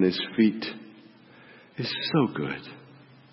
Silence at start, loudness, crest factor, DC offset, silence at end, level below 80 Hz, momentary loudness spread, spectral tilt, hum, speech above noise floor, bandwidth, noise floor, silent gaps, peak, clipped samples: 0 s; -27 LUFS; 18 dB; under 0.1%; 0.55 s; -70 dBFS; 20 LU; -9.5 dB/octave; none; 26 dB; 5.8 kHz; -52 dBFS; none; -10 dBFS; under 0.1%